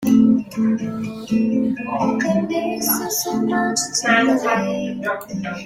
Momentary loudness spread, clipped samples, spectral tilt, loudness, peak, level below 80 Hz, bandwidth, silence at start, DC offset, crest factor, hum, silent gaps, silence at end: 9 LU; under 0.1%; -4 dB/octave; -19 LUFS; -4 dBFS; -56 dBFS; 16 kHz; 0 s; under 0.1%; 16 dB; none; none; 0 s